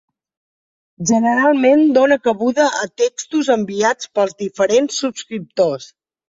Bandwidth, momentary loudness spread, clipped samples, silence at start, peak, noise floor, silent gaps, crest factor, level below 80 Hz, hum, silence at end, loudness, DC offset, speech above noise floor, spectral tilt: 7.8 kHz; 10 LU; under 0.1%; 1 s; -2 dBFS; under -90 dBFS; none; 14 dB; -62 dBFS; none; 0.45 s; -16 LUFS; under 0.1%; over 74 dB; -4 dB/octave